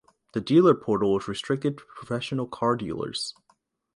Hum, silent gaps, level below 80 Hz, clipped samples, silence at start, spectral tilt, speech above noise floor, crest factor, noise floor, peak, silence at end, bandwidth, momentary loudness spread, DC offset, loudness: none; none; -60 dBFS; under 0.1%; 0.35 s; -6 dB/octave; 42 dB; 18 dB; -67 dBFS; -8 dBFS; 0.65 s; 11.5 kHz; 14 LU; under 0.1%; -26 LUFS